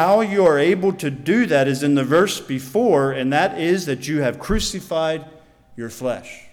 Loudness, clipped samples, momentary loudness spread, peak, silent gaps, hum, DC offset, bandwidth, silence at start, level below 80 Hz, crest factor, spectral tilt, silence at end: -19 LUFS; under 0.1%; 10 LU; -6 dBFS; none; none; under 0.1%; 18 kHz; 0 s; -40 dBFS; 14 dB; -5 dB/octave; 0.05 s